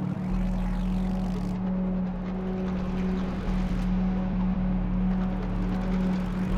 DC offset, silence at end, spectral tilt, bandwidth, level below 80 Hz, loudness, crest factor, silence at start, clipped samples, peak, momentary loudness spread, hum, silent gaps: under 0.1%; 0 s; -9 dB/octave; 6.6 kHz; -32 dBFS; -29 LUFS; 12 dB; 0 s; under 0.1%; -16 dBFS; 3 LU; none; none